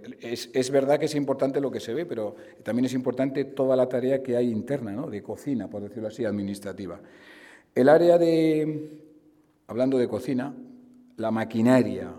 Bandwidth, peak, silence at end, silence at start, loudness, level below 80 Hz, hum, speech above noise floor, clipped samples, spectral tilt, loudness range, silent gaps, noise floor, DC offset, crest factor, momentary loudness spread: 15.5 kHz; -6 dBFS; 0 s; 0 s; -25 LUFS; -70 dBFS; none; 36 dB; under 0.1%; -6.5 dB/octave; 6 LU; none; -60 dBFS; under 0.1%; 20 dB; 15 LU